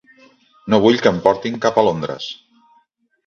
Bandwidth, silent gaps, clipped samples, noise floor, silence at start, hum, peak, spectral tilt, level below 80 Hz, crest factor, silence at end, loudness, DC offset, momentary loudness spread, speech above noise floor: 7.4 kHz; none; under 0.1%; -61 dBFS; 0.65 s; none; 0 dBFS; -5.5 dB/octave; -54 dBFS; 18 dB; 0.9 s; -17 LUFS; under 0.1%; 16 LU; 44 dB